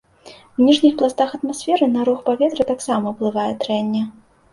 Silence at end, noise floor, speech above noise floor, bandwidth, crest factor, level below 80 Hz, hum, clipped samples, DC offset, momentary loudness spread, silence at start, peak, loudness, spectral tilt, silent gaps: 0.4 s; -45 dBFS; 27 dB; 11.5 kHz; 16 dB; -58 dBFS; none; under 0.1%; under 0.1%; 9 LU; 0.25 s; -2 dBFS; -19 LUFS; -5 dB/octave; none